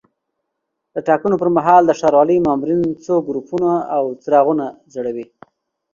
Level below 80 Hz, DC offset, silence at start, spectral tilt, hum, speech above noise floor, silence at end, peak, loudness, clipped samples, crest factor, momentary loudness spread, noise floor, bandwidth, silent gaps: -56 dBFS; under 0.1%; 0.95 s; -7.5 dB/octave; none; 60 dB; 0.7 s; 0 dBFS; -16 LUFS; under 0.1%; 16 dB; 13 LU; -76 dBFS; 7.4 kHz; none